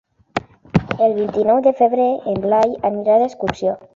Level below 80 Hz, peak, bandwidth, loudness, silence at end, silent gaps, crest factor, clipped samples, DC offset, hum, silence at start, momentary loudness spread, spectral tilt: -48 dBFS; -2 dBFS; 7.6 kHz; -18 LUFS; 0.2 s; none; 16 dB; under 0.1%; under 0.1%; none; 0.35 s; 10 LU; -7.5 dB/octave